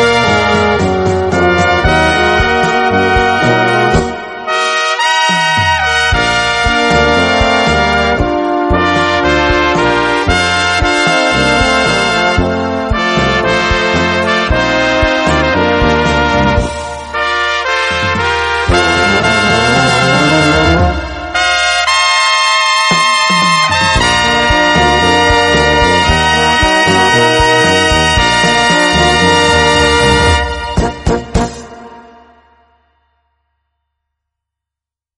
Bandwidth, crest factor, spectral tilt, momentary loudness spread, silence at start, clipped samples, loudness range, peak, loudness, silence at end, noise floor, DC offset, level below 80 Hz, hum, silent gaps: 11.5 kHz; 10 dB; -4 dB/octave; 5 LU; 0 s; under 0.1%; 3 LU; 0 dBFS; -10 LUFS; 3.15 s; -85 dBFS; under 0.1%; -24 dBFS; none; none